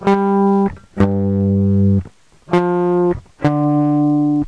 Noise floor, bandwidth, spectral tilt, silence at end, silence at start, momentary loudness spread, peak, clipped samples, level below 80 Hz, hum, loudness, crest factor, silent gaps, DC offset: -39 dBFS; 7.4 kHz; -9.5 dB/octave; 0 s; 0 s; 5 LU; -2 dBFS; under 0.1%; -42 dBFS; none; -16 LUFS; 14 dB; none; 0.3%